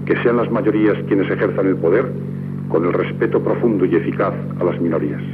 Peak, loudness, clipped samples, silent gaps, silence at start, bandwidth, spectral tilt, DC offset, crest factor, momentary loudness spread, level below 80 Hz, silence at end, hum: -4 dBFS; -18 LUFS; under 0.1%; none; 0 s; 4.7 kHz; -10.5 dB/octave; under 0.1%; 14 dB; 5 LU; -66 dBFS; 0 s; none